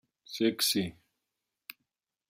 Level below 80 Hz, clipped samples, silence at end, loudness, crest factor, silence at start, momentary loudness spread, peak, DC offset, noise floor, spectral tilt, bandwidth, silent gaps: -72 dBFS; under 0.1%; 1.4 s; -30 LUFS; 20 dB; 0.3 s; 22 LU; -16 dBFS; under 0.1%; -87 dBFS; -3 dB/octave; 16 kHz; none